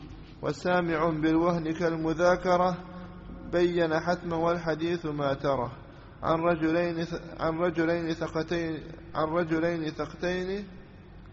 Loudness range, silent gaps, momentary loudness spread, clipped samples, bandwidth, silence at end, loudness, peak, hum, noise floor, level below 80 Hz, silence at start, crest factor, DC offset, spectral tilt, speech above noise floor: 3 LU; none; 12 LU; under 0.1%; 7.6 kHz; 0 s; -28 LUFS; -12 dBFS; none; -48 dBFS; -50 dBFS; 0 s; 18 dB; under 0.1%; -5.5 dB/octave; 20 dB